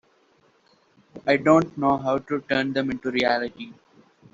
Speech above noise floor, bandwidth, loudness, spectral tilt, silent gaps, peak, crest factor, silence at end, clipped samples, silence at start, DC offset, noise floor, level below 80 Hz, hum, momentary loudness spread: 39 dB; 7.8 kHz; -23 LUFS; -4 dB/octave; none; -4 dBFS; 20 dB; 0.6 s; under 0.1%; 1.15 s; under 0.1%; -62 dBFS; -60 dBFS; none; 13 LU